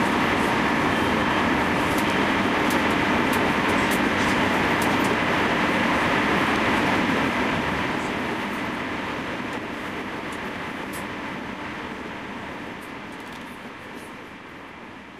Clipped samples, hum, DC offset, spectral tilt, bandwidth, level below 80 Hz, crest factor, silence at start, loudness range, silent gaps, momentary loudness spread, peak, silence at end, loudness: under 0.1%; none; under 0.1%; -4.5 dB/octave; 15.5 kHz; -46 dBFS; 18 dB; 0 s; 12 LU; none; 15 LU; -6 dBFS; 0 s; -23 LUFS